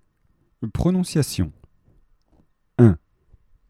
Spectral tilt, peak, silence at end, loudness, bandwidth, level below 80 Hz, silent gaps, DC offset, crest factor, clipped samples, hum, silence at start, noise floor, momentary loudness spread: -7 dB/octave; 0 dBFS; 0.75 s; -21 LUFS; 15 kHz; -42 dBFS; none; under 0.1%; 22 dB; under 0.1%; none; 0.6 s; -64 dBFS; 14 LU